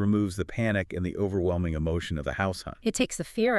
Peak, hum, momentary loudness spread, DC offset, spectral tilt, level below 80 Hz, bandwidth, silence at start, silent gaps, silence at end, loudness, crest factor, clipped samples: -12 dBFS; none; 4 LU; under 0.1%; -5.5 dB/octave; -44 dBFS; 13 kHz; 0 s; none; 0 s; -29 LUFS; 16 dB; under 0.1%